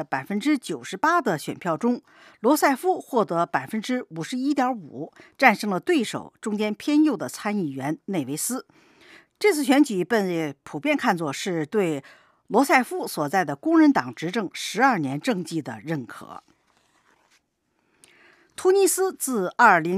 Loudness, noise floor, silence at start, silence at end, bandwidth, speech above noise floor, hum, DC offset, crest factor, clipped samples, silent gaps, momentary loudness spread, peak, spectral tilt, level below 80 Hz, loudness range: -23 LUFS; -72 dBFS; 0 s; 0 s; 15.5 kHz; 49 dB; none; under 0.1%; 22 dB; under 0.1%; none; 12 LU; -2 dBFS; -4.5 dB/octave; -76 dBFS; 5 LU